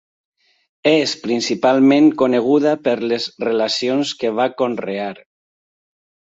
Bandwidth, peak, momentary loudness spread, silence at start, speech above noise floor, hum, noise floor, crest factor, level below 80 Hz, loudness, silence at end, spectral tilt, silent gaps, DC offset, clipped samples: 8 kHz; -2 dBFS; 9 LU; 0.85 s; over 74 dB; none; under -90 dBFS; 16 dB; -64 dBFS; -17 LUFS; 1.15 s; -4.5 dB/octave; none; under 0.1%; under 0.1%